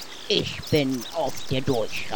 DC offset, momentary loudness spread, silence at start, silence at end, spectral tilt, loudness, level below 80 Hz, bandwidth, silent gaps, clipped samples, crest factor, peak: under 0.1%; 5 LU; 0 s; 0 s; -4.5 dB/octave; -26 LUFS; -50 dBFS; over 20 kHz; none; under 0.1%; 20 dB; -6 dBFS